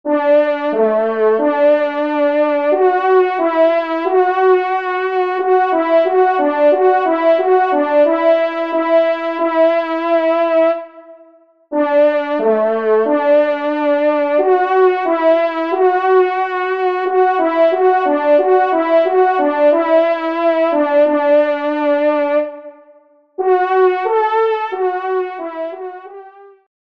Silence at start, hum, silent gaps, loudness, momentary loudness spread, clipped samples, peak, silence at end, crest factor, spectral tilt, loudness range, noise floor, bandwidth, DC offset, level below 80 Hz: 0.05 s; none; none; -14 LUFS; 5 LU; under 0.1%; -2 dBFS; 0.4 s; 12 dB; -6 dB/octave; 3 LU; -48 dBFS; 5.6 kHz; 0.2%; -70 dBFS